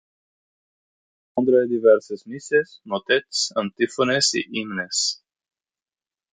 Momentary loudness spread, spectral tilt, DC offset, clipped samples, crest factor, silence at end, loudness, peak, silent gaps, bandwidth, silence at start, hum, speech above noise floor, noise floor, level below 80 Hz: 12 LU; -2.5 dB/octave; under 0.1%; under 0.1%; 20 dB; 1.2 s; -21 LUFS; -4 dBFS; none; 9.6 kHz; 1.35 s; none; over 69 dB; under -90 dBFS; -68 dBFS